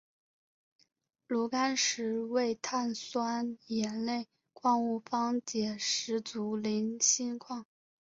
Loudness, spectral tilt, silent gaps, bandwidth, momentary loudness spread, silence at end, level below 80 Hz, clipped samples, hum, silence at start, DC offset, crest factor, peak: -32 LUFS; -2.5 dB/octave; none; 7.8 kHz; 8 LU; 0.45 s; -78 dBFS; under 0.1%; none; 1.3 s; under 0.1%; 22 dB; -12 dBFS